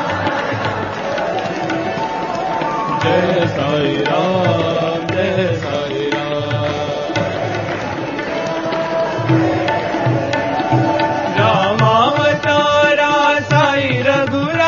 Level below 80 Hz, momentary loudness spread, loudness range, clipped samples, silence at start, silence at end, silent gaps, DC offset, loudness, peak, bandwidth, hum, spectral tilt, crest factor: -48 dBFS; 8 LU; 6 LU; under 0.1%; 0 s; 0 s; none; under 0.1%; -16 LUFS; 0 dBFS; 7.2 kHz; none; -6 dB/octave; 16 dB